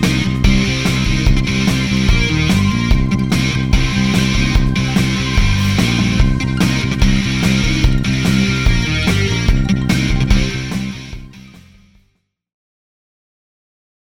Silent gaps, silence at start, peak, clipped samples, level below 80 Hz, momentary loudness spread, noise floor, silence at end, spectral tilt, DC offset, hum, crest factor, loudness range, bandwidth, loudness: none; 0 s; 0 dBFS; under 0.1%; -20 dBFS; 2 LU; -63 dBFS; 2.65 s; -5 dB/octave; 0.3%; none; 14 dB; 6 LU; 16 kHz; -15 LUFS